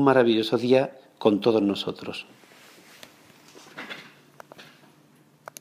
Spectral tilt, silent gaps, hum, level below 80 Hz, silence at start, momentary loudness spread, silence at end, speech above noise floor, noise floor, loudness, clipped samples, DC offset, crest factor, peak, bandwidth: -6 dB/octave; none; none; -74 dBFS; 0 s; 24 LU; 1 s; 36 dB; -58 dBFS; -23 LUFS; under 0.1%; under 0.1%; 20 dB; -6 dBFS; 15.5 kHz